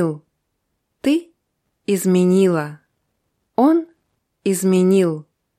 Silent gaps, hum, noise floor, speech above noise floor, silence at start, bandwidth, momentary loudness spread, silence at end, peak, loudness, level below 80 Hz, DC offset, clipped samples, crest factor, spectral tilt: none; none; -73 dBFS; 57 dB; 0 s; 15 kHz; 17 LU; 0.35 s; -4 dBFS; -18 LUFS; -68 dBFS; under 0.1%; under 0.1%; 16 dB; -6.5 dB/octave